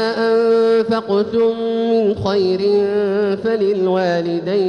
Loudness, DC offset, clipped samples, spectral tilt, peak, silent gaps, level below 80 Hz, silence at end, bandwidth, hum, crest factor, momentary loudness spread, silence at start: -16 LUFS; under 0.1%; under 0.1%; -7 dB/octave; -6 dBFS; none; -54 dBFS; 0 s; 9.4 kHz; none; 10 dB; 4 LU; 0 s